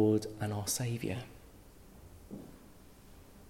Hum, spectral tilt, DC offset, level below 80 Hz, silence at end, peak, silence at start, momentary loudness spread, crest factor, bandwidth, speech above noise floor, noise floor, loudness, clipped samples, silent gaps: none; -5 dB/octave; under 0.1%; -60 dBFS; 0 s; -16 dBFS; 0 s; 24 LU; 20 dB; 16.5 kHz; 23 dB; -57 dBFS; -35 LUFS; under 0.1%; none